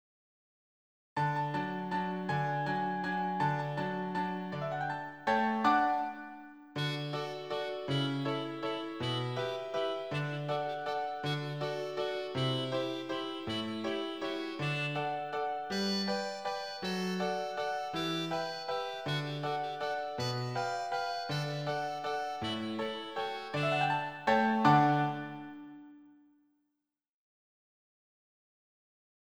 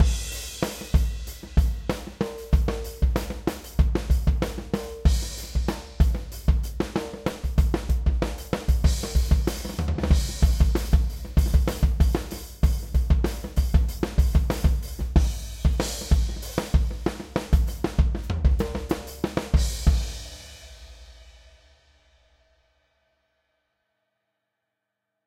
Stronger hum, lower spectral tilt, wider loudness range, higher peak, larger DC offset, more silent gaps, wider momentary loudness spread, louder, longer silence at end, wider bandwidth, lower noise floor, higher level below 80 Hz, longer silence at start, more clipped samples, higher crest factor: neither; about the same, -5.5 dB/octave vs -6 dB/octave; about the same, 5 LU vs 3 LU; second, -12 dBFS vs -6 dBFS; neither; neither; about the same, 8 LU vs 8 LU; second, -34 LUFS vs -26 LUFS; second, 3.05 s vs 3.95 s; first, over 20 kHz vs 16 kHz; first, -88 dBFS vs -82 dBFS; second, -72 dBFS vs -26 dBFS; first, 1.15 s vs 0 s; neither; about the same, 22 dB vs 18 dB